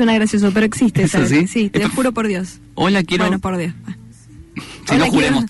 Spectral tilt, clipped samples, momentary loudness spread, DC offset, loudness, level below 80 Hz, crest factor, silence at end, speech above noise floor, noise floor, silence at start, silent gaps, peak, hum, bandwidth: -5.5 dB/octave; under 0.1%; 18 LU; under 0.1%; -16 LUFS; -42 dBFS; 10 dB; 0 s; 24 dB; -40 dBFS; 0 s; none; -6 dBFS; none; 12 kHz